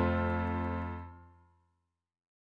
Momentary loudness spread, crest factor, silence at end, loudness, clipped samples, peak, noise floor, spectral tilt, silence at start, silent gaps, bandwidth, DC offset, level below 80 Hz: 14 LU; 20 dB; 1.25 s; -35 LUFS; under 0.1%; -16 dBFS; -82 dBFS; -9.5 dB/octave; 0 s; none; 4.8 kHz; under 0.1%; -50 dBFS